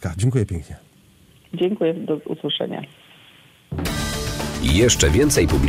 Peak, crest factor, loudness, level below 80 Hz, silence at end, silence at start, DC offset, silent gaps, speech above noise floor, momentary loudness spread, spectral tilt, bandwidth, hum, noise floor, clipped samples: -4 dBFS; 16 dB; -20 LUFS; -32 dBFS; 0 s; 0 s; under 0.1%; none; 33 dB; 17 LU; -4.5 dB/octave; 16 kHz; none; -52 dBFS; under 0.1%